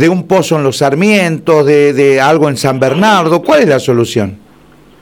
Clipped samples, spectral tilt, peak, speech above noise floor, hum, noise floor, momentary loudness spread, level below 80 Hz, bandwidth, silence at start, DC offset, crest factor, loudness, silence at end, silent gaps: under 0.1%; -5.5 dB/octave; 0 dBFS; 33 dB; none; -42 dBFS; 4 LU; -50 dBFS; 17.5 kHz; 0 s; under 0.1%; 10 dB; -9 LUFS; 0.65 s; none